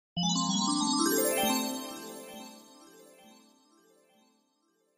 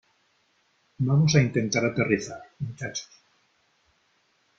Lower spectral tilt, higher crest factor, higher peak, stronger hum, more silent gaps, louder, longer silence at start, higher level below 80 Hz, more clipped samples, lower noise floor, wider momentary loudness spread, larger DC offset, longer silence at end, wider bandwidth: second, -3 dB/octave vs -5.5 dB/octave; second, 18 dB vs 24 dB; second, -16 dBFS vs -4 dBFS; neither; neither; second, -28 LUFS vs -25 LUFS; second, 0.15 s vs 1 s; second, -70 dBFS vs -58 dBFS; neither; first, -73 dBFS vs -68 dBFS; about the same, 18 LU vs 16 LU; neither; first, 1.7 s vs 1.55 s; first, 15.5 kHz vs 7.6 kHz